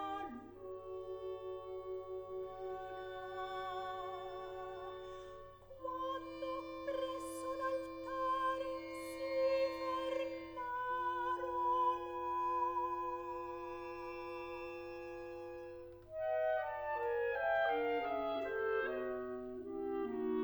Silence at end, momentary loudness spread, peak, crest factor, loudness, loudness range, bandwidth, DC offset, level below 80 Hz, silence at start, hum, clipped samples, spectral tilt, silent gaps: 0 s; 12 LU; -26 dBFS; 14 dB; -41 LUFS; 8 LU; over 20 kHz; under 0.1%; -66 dBFS; 0 s; none; under 0.1%; -5 dB/octave; none